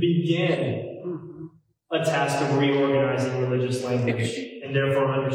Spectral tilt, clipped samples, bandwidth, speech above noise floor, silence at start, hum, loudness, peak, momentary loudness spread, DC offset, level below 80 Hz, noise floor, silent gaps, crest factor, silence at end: -6.5 dB/octave; under 0.1%; 15 kHz; 21 dB; 0 s; none; -24 LUFS; -10 dBFS; 13 LU; under 0.1%; -66 dBFS; -45 dBFS; none; 14 dB; 0 s